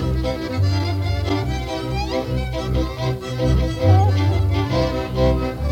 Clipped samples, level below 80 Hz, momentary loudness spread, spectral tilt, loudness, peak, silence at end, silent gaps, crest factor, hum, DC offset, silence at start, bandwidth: under 0.1%; -26 dBFS; 8 LU; -7 dB/octave; -21 LUFS; -4 dBFS; 0 s; none; 16 dB; none; under 0.1%; 0 s; 9.4 kHz